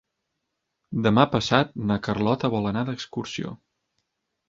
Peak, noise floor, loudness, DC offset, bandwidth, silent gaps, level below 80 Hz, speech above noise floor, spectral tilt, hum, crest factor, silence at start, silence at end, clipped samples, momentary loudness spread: -2 dBFS; -80 dBFS; -24 LUFS; under 0.1%; 7.8 kHz; none; -54 dBFS; 56 dB; -6 dB/octave; none; 24 dB; 0.9 s; 0.95 s; under 0.1%; 13 LU